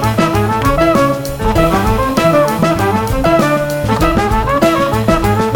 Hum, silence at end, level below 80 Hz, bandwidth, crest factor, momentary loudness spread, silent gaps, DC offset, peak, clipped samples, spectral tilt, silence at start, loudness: none; 0 s; -24 dBFS; 19 kHz; 12 dB; 3 LU; none; under 0.1%; 0 dBFS; under 0.1%; -6 dB/octave; 0 s; -13 LUFS